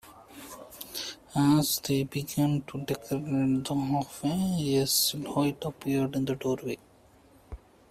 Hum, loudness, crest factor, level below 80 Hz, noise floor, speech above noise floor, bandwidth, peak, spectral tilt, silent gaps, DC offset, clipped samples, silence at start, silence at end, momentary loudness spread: none; -29 LUFS; 16 dB; -58 dBFS; -58 dBFS; 30 dB; 16 kHz; -12 dBFS; -5 dB/octave; none; under 0.1%; under 0.1%; 0.05 s; 0.35 s; 20 LU